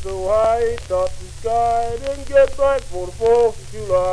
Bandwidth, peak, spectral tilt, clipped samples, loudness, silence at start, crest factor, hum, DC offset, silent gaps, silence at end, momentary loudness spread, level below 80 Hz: 11 kHz; -4 dBFS; -5 dB/octave; under 0.1%; -19 LUFS; 0 s; 16 dB; none; under 0.1%; none; 0 s; 10 LU; -34 dBFS